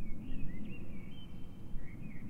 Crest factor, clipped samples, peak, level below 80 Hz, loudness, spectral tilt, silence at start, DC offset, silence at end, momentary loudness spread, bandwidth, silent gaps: 12 dB; under 0.1%; -22 dBFS; -44 dBFS; -48 LUFS; -7.5 dB/octave; 0 s; under 0.1%; 0 s; 5 LU; 3.3 kHz; none